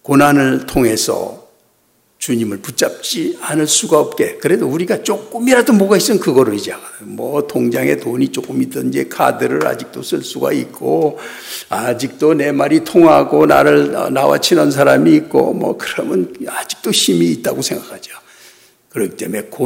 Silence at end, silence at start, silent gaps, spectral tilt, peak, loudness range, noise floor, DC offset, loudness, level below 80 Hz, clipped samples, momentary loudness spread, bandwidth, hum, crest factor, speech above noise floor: 0 s; 0.05 s; none; -4.5 dB/octave; 0 dBFS; 7 LU; -57 dBFS; under 0.1%; -14 LUFS; -48 dBFS; under 0.1%; 12 LU; 16.5 kHz; none; 14 dB; 43 dB